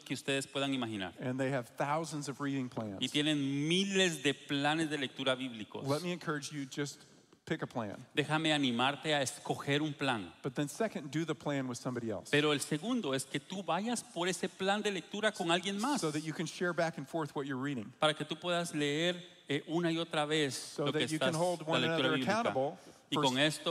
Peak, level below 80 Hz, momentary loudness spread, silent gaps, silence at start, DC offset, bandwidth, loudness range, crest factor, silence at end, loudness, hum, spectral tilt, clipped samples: -14 dBFS; -80 dBFS; 9 LU; none; 0 s; under 0.1%; 15 kHz; 3 LU; 20 dB; 0 s; -34 LUFS; none; -4 dB/octave; under 0.1%